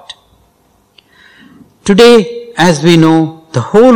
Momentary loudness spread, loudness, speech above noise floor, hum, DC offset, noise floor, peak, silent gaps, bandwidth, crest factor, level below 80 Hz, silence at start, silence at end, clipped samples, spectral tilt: 14 LU; -8 LUFS; 46 dB; none; under 0.1%; -52 dBFS; 0 dBFS; none; 16 kHz; 10 dB; -44 dBFS; 0.1 s; 0 s; 5%; -5.5 dB/octave